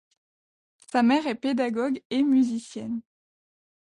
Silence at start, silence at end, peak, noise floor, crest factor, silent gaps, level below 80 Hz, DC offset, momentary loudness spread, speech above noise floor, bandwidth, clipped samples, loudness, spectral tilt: 0.95 s; 0.9 s; -12 dBFS; under -90 dBFS; 16 dB; 2.05-2.10 s; -70 dBFS; under 0.1%; 12 LU; over 66 dB; 11 kHz; under 0.1%; -25 LUFS; -5 dB/octave